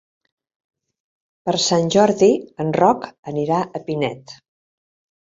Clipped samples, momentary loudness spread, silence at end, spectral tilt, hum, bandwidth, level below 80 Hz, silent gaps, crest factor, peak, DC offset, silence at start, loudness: under 0.1%; 11 LU; 1 s; -5 dB/octave; none; 7.8 kHz; -60 dBFS; 3.19-3.23 s; 20 dB; -2 dBFS; under 0.1%; 1.45 s; -19 LUFS